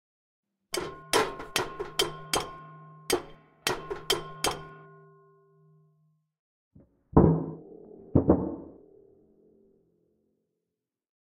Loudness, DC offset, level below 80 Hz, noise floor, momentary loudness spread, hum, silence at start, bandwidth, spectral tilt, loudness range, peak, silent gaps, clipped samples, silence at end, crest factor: -29 LUFS; under 0.1%; -46 dBFS; -87 dBFS; 23 LU; none; 0.7 s; 16 kHz; -4.5 dB/octave; 6 LU; -6 dBFS; 6.39-6.71 s; under 0.1%; 2.5 s; 26 dB